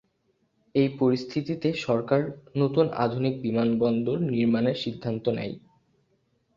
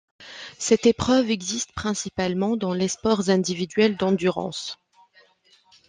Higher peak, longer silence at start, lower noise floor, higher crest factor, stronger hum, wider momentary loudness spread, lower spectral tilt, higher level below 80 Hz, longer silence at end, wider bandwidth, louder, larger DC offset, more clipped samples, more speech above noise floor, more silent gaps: about the same, -8 dBFS vs -6 dBFS; first, 0.75 s vs 0.2 s; first, -71 dBFS vs -59 dBFS; about the same, 18 dB vs 18 dB; neither; second, 7 LU vs 14 LU; first, -8 dB/octave vs -4.5 dB/octave; second, -64 dBFS vs -56 dBFS; second, 1 s vs 1.15 s; second, 7.4 kHz vs 10 kHz; second, -26 LUFS vs -23 LUFS; neither; neither; first, 46 dB vs 37 dB; neither